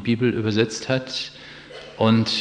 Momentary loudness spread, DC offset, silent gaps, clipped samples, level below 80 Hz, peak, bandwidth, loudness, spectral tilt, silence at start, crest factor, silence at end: 20 LU; under 0.1%; none; under 0.1%; -58 dBFS; -6 dBFS; 10 kHz; -22 LUFS; -5.5 dB/octave; 0 s; 18 dB; 0 s